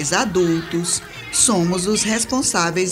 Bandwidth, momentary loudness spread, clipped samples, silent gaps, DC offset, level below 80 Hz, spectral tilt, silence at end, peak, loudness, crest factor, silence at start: 16 kHz; 6 LU; under 0.1%; none; under 0.1%; -46 dBFS; -3 dB/octave; 0 s; -2 dBFS; -18 LUFS; 18 dB; 0 s